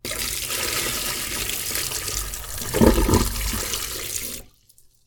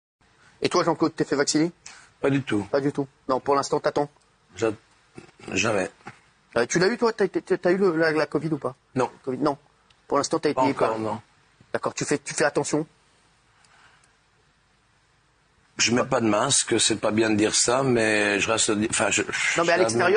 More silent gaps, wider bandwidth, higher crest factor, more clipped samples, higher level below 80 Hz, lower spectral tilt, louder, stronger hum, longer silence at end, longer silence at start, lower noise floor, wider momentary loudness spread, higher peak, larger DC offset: neither; first, 19.5 kHz vs 10 kHz; about the same, 24 dB vs 20 dB; neither; first, -32 dBFS vs -62 dBFS; about the same, -3 dB/octave vs -3.5 dB/octave; about the same, -23 LUFS vs -23 LUFS; neither; first, 0.55 s vs 0 s; second, 0.05 s vs 0.6 s; second, -55 dBFS vs -63 dBFS; about the same, 10 LU vs 9 LU; first, 0 dBFS vs -6 dBFS; neither